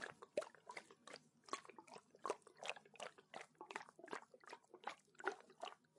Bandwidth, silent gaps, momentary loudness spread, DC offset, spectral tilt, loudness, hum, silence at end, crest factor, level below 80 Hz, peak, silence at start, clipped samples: 11.5 kHz; none; 11 LU; under 0.1%; -2 dB/octave; -53 LUFS; none; 0.2 s; 30 dB; under -90 dBFS; -24 dBFS; 0 s; under 0.1%